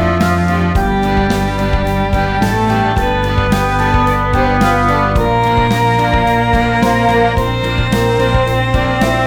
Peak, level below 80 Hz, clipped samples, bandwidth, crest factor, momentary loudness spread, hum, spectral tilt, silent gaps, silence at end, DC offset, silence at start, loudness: -2 dBFS; -22 dBFS; under 0.1%; 19.5 kHz; 12 dB; 3 LU; none; -6.5 dB/octave; none; 0 s; under 0.1%; 0 s; -13 LUFS